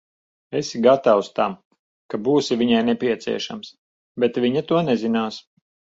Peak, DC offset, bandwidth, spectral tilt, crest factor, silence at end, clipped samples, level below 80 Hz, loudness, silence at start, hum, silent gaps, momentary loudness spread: -2 dBFS; under 0.1%; 7.8 kHz; -5.5 dB/octave; 20 dB; 0.55 s; under 0.1%; -64 dBFS; -21 LUFS; 0.5 s; none; 1.65-1.71 s, 1.79-2.09 s, 3.78-4.15 s; 15 LU